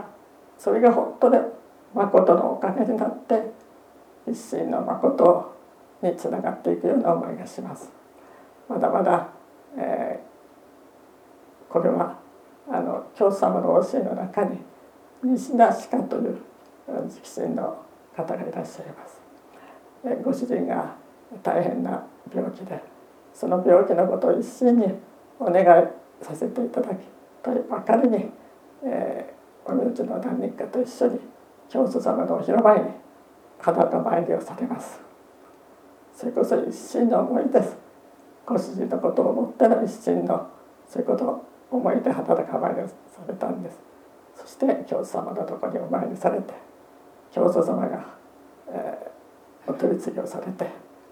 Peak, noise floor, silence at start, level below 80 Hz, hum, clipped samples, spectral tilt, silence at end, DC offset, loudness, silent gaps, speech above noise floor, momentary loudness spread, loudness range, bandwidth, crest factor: -2 dBFS; -51 dBFS; 0 s; -76 dBFS; none; under 0.1%; -7.5 dB/octave; 0.35 s; under 0.1%; -24 LUFS; none; 29 dB; 18 LU; 8 LU; 14.5 kHz; 22 dB